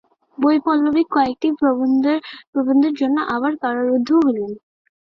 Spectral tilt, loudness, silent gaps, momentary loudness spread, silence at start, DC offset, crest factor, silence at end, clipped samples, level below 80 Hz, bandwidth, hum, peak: -6.5 dB/octave; -18 LUFS; 2.47-2.53 s; 7 LU; 0.4 s; under 0.1%; 14 dB; 0.45 s; under 0.1%; -60 dBFS; 6.2 kHz; none; -4 dBFS